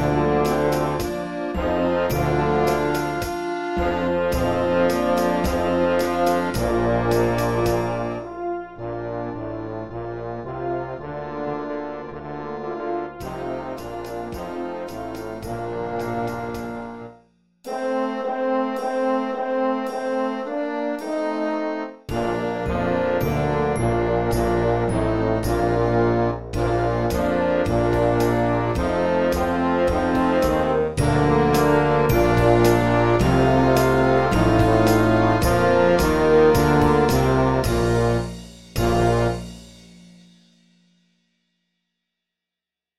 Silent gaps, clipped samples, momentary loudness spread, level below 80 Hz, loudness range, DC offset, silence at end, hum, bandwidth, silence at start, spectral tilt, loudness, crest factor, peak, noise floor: none; under 0.1%; 14 LU; -36 dBFS; 12 LU; 0.6%; 0 s; 60 Hz at -50 dBFS; 16 kHz; 0 s; -6.5 dB/octave; -21 LUFS; 18 dB; -4 dBFS; -88 dBFS